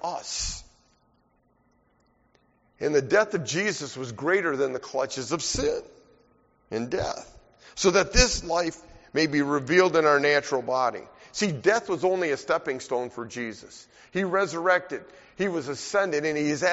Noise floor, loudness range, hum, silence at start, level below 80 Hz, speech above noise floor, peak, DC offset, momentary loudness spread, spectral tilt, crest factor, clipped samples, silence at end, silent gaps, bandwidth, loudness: -66 dBFS; 6 LU; none; 0.05 s; -42 dBFS; 41 dB; -2 dBFS; under 0.1%; 14 LU; -3 dB/octave; 24 dB; under 0.1%; 0 s; none; 8 kHz; -25 LUFS